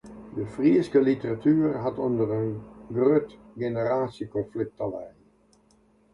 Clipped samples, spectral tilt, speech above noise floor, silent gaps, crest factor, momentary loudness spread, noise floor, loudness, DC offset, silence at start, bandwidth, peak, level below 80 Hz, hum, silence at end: under 0.1%; -9 dB/octave; 36 dB; none; 18 dB; 13 LU; -62 dBFS; -26 LUFS; under 0.1%; 0.05 s; 10.5 kHz; -10 dBFS; -60 dBFS; none; 1.05 s